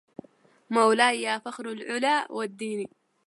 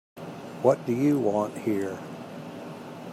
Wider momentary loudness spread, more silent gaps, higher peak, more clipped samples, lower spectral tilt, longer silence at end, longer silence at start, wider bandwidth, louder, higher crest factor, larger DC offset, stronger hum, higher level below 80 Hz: about the same, 15 LU vs 16 LU; neither; about the same, -6 dBFS vs -6 dBFS; neither; second, -3 dB/octave vs -7.5 dB/octave; first, 0.4 s vs 0 s; first, 0.7 s vs 0.15 s; second, 11.5 kHz vs 15.5 kHz; about the same, -26 LUFS vs -26 LUFS; about the same, 20 dB vs 22 dB; neither; neither; second, -82 dBFS vs -72 dBFS